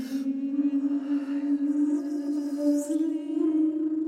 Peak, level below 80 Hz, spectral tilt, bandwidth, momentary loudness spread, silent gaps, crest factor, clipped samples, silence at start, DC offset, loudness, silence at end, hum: -14 dBFS; -80 dBFS; -5 dB/octave; 13 kHz; 4 LU; none; 12 dB; under 0.1%; 0 s; under 0.1%; -27 LUFS; 0 s; none